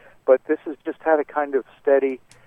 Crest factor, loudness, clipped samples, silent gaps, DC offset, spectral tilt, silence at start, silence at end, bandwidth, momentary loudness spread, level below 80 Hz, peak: 18 dB; -22 LUFS; under 0.1%; none; under 0.1%; -6.5 dB/octave; 0.25 s; 0.3 s; 5.6 kHz; 7 LU; -66 dBFS; -4 dBFS